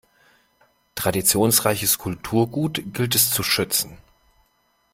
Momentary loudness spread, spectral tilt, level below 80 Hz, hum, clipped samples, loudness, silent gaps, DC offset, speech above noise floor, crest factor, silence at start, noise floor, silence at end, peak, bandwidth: 9 LU; -3 dB/octave; -52 dBFS; none; under 0.1%; -20 LUFS; none; under 0.1%; 44 dB; 22 dB; 0.95 s; -65 dBFS; 1 s; -2 dBFS; 16.5 kHz